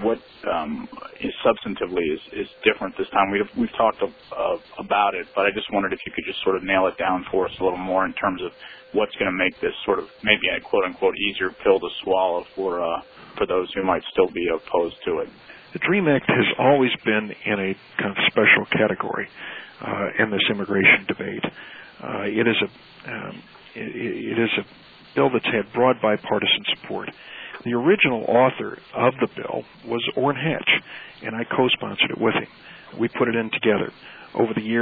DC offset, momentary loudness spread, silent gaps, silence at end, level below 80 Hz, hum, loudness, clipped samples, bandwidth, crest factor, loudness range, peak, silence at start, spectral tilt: under 0.1%; 14 LU; none; 0 s; -58 dBFS; none; -22 LUFS; under 0.1%; 4.9 kHz; 22 dB; 4 LU; -2 dBFS; 0 s; -8.5 dB/octave